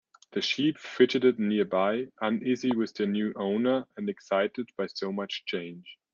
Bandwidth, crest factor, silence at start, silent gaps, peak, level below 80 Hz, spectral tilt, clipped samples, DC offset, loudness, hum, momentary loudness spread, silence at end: 7.2 kHz; 20 dB; 0.35 s; none; -8 dBFS; -74 dBFS; -5.5 dB/octave; under 0.1%; under 0.1%; -28 LUFS; none; 10 LU; 0.2 s